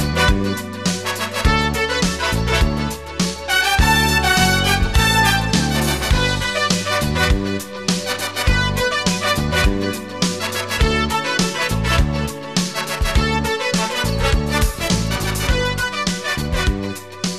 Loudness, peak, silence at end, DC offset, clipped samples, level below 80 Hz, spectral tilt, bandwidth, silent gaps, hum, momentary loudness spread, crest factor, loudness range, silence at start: -18 LUFS; 0 dBFS; 0 s; 0.5%; under 0.1%; -24 dBFS; -4 dB/octave; 14 kHz; none; none; 8 LU; 18 dB; 4 LU; 0 s